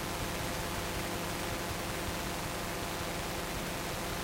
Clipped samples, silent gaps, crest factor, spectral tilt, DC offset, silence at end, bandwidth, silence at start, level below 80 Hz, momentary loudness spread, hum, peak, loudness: under 0.1%; none; 14 dB; -3.5 dB/octave; under 0.1%; 0 s; 16 kHz; 0 s; -46 dBFS; 1 LU; none; -22 dBFS; -36 LUFS